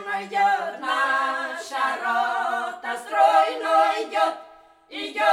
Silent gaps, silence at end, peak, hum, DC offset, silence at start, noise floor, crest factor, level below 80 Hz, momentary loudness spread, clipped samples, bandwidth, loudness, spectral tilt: none; 0 s; -6 dBFS; none; under 0.1%; 0 s; -50 dBFS; 16 dB; -74 dBFS; 11 LU; under 0.1%; 14 kHz; -23 LUFS; -1.5 dB/octave